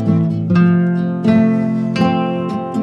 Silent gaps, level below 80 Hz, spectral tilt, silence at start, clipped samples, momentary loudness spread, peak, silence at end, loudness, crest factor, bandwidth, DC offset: none; -54 dBFS; -9 dB/octave; 0 s; under 0.1%; 6 LU; -2 dBFS; 0 s; -15 LUFS; 12 dB; 6.6 kHz; under 0.1%